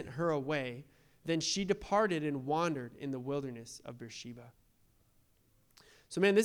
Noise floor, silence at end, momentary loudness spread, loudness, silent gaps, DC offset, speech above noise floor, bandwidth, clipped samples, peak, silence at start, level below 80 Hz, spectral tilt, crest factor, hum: -70 dBFS; 0 s; 16 LU; -35 LUFS; none; under 0.1%; 36 dB; 15.5 kHz; under 0.1%; -14 dBFS; 0 s; -66 dBFS; -4.5 dB/octave; 22 dB; none